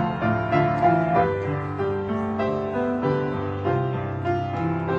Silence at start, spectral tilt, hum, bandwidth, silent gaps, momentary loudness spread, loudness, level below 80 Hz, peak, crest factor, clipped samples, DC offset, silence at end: 0 s; -9 dB/octave; none; 7.6 kHz; none; 7 LU; -24 LUFS; -48 dBFS; -6 dBFS; 16 dB; under 0.1%; under 0.1%; 0 s